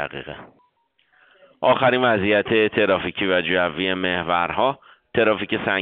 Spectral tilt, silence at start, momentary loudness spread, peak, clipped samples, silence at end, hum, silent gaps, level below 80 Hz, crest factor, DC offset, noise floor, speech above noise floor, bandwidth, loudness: -2.5 dB/octave; 0 s; 11 LU; -4 dBFS; under 0.1%; 0 s; none; none; -56 dBFS; 18 dB; under 0.1%; -65 dBFS; 44 dB; 4.7 kHz; -20 LUFS